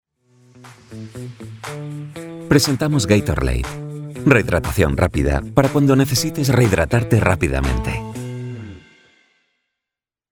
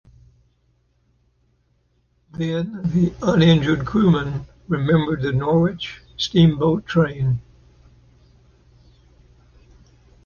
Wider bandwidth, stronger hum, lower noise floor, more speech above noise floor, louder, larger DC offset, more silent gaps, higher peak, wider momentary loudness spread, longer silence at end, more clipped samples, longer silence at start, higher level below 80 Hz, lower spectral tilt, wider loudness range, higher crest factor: first, 18 kHz vs 7 kHz; neither; first, -87 dBFS vs -64 dBFS; first, 69 dB vs 46 dB; about the same, -18 LUFS vs -20 LUFS; neither; neither; first, 0 dBFS vs -4 dBFS; first, 18 LU vs 12 LU; second, 1.55 s vs 2.85 s; neither; second, 0.65 s vs 2.35 s; first, -30 dBFS vs -46 dBFS; second, -5.5 dB/octave vs -7.5 dB/octave; second, 5 LU vs 8 LU; about the same, 20 dB vs 18 dB